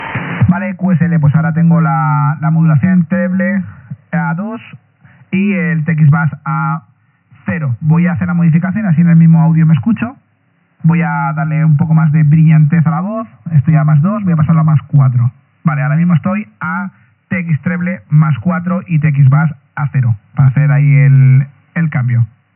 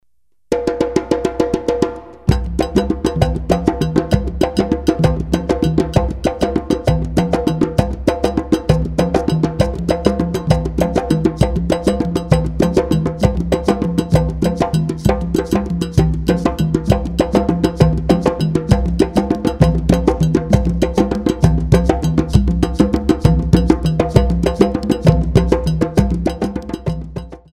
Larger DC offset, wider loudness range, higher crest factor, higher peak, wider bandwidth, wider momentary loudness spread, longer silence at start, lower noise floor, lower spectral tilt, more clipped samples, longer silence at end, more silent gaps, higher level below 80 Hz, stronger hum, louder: second, under 0.1% vs 0.3%; about the same, 4 LU vs 2 LU; about the same, 12 dB vs 16 dB; about the same, 0 dBFS vs 0 dBFS; second, 3.1 kHz vs 15 kHz; first, 11 LU vs 4 LU; second, 0 s vs 0.5 s; second, -56 dBFS vs -67 dBFS; first, -9.5 dB/octave vs -7.5 dB/octave; neither; first, 0.3 s vs 0.15 s; neither; second, -54 dBFS vs -24 dBFS; neither; first, -12 LUFS vs -16 LUFS